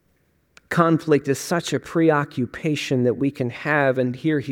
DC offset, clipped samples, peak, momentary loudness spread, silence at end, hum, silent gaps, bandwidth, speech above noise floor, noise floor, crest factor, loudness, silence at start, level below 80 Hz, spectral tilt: under 0.1%; under 0.1%; -2 dBFS; 6 LU; 0 s; none; none; 17 kHz; 44 dB; -64 dBFS; 20 dB; -21 LUFS; 0.7 s; -60 dBFS; -6 dB/octave